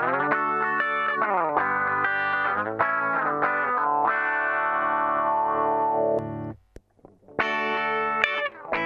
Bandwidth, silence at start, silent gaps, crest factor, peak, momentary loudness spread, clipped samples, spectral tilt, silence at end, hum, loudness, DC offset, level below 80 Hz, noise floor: 7.8 kHz; 0 s; none; 22 dB; -2 dBFS; 3 LU; under 0.1%; -6 dB/octave; 0 s; none; -24 LUFS; under 0.1%; -64 dBFS; -55 dBFS